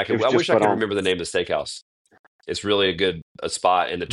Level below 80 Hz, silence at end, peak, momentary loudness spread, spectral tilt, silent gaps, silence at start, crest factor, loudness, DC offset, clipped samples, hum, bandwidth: -56 dBFS; 0 s; -4 dBFS; 13 LU; -4 dB/octave; 1.82-2.05 s, 2.19-2.39 s, 3.22-3.35 s; 0 s; 18 dB; -22 LUFS; under 0.1%; under 0.1%; none; 12 kHz